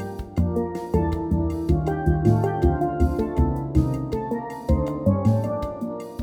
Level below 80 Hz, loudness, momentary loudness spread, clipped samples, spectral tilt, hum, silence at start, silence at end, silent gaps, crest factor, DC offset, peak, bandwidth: -30 dBFS; -24 LUFS; 8 LU; under 0.1%; -9.5 dB/octave; none; 0 s; 0 s; none; 18 dB; under 0.1%; -6 dBFS; 14.5 kHz